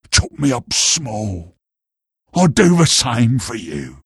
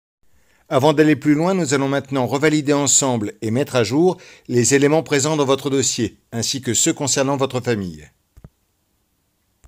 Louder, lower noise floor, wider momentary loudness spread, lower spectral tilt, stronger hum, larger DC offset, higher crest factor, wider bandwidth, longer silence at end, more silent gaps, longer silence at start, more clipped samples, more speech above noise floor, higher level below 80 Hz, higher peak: first, -15 LUFS vs -18 LUFS; first, -84 dBFS vs -67 dBFS; first, 14 LU vs 9 LU; about the same, -4 dB/octave vs -4 dB/octave; neither; neither; about the same, 16 dB vs 18 dB; second, 12.5 kHz vs 16.5 kHz; second, 0.1 s vs 1.6 s; neither; second, 0.1 s vs 0.7 s; neither; first, 68 dB vs 49 dB; first, -36 dBFS vs -58 dBFS; about the same, 0 dBFS vs -2 dBFS